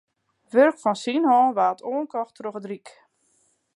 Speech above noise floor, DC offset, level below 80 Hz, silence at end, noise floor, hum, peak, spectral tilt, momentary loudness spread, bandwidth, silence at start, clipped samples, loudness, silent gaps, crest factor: 44 dB; under 0.1%; -82 dBFS; 1 s; -66 dBFS; none; -6 dBFS; -5 dB/octave; 16 LU; 11 kHz; 0.55 s; under 0.1%; -22 LUFS; none; 18 dB